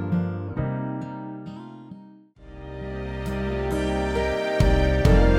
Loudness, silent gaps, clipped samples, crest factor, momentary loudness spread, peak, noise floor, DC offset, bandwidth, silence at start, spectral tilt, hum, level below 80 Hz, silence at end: -25 LUFS; none; under 0.1%; 18 dB; 20 LU; -6 dBFS; -48 dBFS; under 0.1%; 13.5 kHz; 0 s; -7 dB/octave; none; -28 dBFS; 0 s